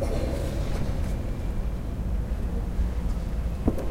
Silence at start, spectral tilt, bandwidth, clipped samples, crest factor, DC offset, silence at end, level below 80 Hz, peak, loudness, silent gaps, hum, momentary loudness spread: 0 s; -7.5 dB/octave; 15.5 kHz; under 0.1%; 18 dB; 0.6%; 0 s; -28 dBFS; -8 dBFS; -31 LUFS; none; none; 3 LU